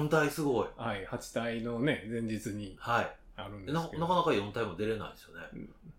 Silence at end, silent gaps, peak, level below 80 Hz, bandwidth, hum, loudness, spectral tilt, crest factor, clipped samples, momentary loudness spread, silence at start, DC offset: 0.05 s; none; -14 dBFS; -56 dBFS; 17 kHz; none; -33 LUFS; -5.5 dB/octave; 18 dB; under 0.1%; 16 LU; 0 s; under 0.1%